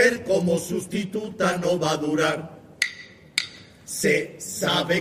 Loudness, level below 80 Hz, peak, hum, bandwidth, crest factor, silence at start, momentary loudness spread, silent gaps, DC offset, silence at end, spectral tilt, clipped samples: -24 LUFS; -60 dBFS; -4 dBFS; none; 15.5 kHz; 20 dB; 0 s; 11 LU; none; under 0.1%; 0 s; -4 dB/octave; under 0.1%